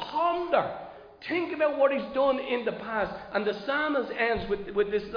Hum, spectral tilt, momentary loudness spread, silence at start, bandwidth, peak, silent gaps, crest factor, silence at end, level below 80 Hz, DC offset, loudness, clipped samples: none; -7 dB/octave; 6 LU; 0 s; 5.2 kHz; -12 dBFS; none; 18 dB; 0 s; -56 dBFS; under 0.1%; -28 LUFS; under 0.1%